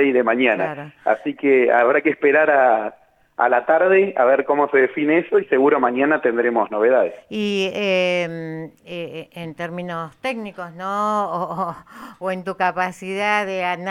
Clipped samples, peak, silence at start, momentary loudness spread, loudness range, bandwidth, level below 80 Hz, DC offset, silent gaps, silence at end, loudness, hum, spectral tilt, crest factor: under 0.1%; -4 dBFS; 0 s; 15 LU; 9 LU; 11.5 kHz; -68 dBFS; under 0.1%; none; 0 s; -19 LUFS; none; -6 dB/octave; 16 dB